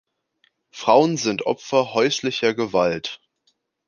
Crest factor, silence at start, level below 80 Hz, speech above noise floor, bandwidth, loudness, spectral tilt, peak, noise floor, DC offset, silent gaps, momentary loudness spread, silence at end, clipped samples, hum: 20 dB; 0.75 s; -62 dBFS; 48 dB; 10 kHz; -20 LUFS; -4 dB/octave; -2 dBFS; -69 dBFS; under 0.1%; none; 11 LU; 0.7 s; under 0.1%; none